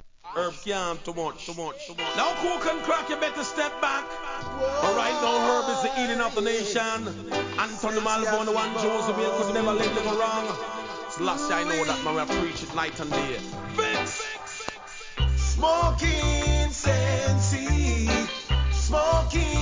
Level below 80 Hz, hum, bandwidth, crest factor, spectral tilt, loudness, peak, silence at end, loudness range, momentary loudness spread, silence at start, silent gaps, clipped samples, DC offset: -32 dBFS; none; 7.6 kHz; 16 dB; -4.5 dB/octave; -26 LUFS; -10 dBFS; 0 s; 4 LU; 9 LU; 0.05 s; none; under 0.1%; under 0.1%